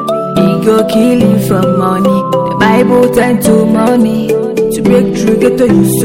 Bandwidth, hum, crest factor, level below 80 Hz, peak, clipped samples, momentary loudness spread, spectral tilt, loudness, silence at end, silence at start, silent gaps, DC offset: 17 kHz; none; 8 dB; -38 dBFS; 0 dBFS; under 0.1%; 4 LU; -6.5 dB/octave; -9 LUFS; 0 s; 0 s; none; 0.5%